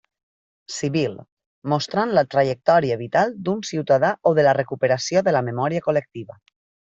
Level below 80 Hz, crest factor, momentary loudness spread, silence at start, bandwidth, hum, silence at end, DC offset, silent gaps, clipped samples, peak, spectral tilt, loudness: -62 dBFS; 18 dB; 10 LU; 0.7 s; 8 kHz; none; 0.7 s; under 0.1%; 1.32-1.37 s, 1.46-1.62 s; under 0.1%; -4 dBFS; -5.5 dB/octave; -21 LUFS